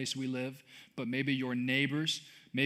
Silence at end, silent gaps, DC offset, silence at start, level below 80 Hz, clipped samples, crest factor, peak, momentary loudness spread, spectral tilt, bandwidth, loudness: 0 s; none; under 0.1%; 0 s; -84 dBFS; under 0.1%; 20 dB; -14 dBFS; 12 LU; -4.5 dB/octave; 15 kHz; -34 LUFS